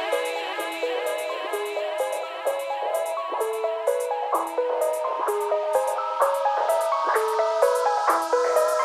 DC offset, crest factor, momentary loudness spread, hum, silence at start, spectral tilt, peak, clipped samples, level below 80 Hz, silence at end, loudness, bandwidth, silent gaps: under 0.1%; 16 dB; 7 LU; none; 0 s; 0 dB/octave; -8 dBFS; under 0.1%; -76 dBFS; 0 s; -25 LUFS; 15.5 kHz; none